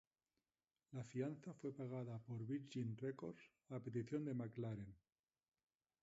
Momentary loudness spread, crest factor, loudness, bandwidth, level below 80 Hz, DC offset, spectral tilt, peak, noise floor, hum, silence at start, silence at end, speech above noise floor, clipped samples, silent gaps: 9 LU; 18 dB; -49 LUFS; 7.6 kHz; -82 dBFS; under 0.1%; -8.5 dB/octave; -32 dBFS; under -90 dBFS; none; 0.9 s; 1.05 s; over 42 dB; under 0.1%; none